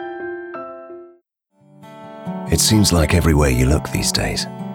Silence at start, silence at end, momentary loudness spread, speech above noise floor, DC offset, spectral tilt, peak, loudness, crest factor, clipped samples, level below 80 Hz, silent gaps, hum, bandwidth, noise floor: 0 s; 0 s; 21 LU; 43 dB; under 0.1%; -4.5 dB/octave; -2 dBFS; -17 LUFS; 18 dB; under 0.1%; -28 dBFS; none; none; 18.5 kHz; -59 dBFS